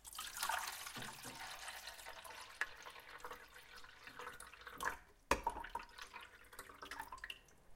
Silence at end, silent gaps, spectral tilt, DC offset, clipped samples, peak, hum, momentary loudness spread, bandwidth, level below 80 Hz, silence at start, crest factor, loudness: 0 s; none; -1.5 dB/octave; under 0.1%; under 0.1%; -18 dBFS; none; 15 LU; 16.5 kHz; -64 dBFS; 0 s; 32 dB; -47 LUFS